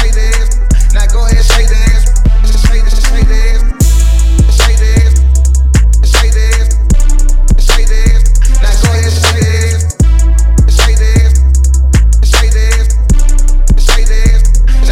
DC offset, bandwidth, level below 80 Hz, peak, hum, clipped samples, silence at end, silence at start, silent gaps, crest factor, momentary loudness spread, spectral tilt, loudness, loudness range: under 0.1%; 15 kHz; -6 dBFS; 0 dBFS; none; under 0.1%; 0 s; 0 s; none; 6 dB; 3 LU; -4.5 dB/octave; -10 LUFS; 1 LU